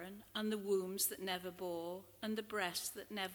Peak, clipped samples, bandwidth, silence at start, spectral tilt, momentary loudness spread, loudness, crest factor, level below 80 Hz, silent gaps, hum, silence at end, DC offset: -22 dBFS; under 0.1%; over 20 kHz; 0 s; -3 dB/octave; 8 LU; -41 LUFS; 20 dB; -76 dBFS; none; none; 0 s; under 0.1%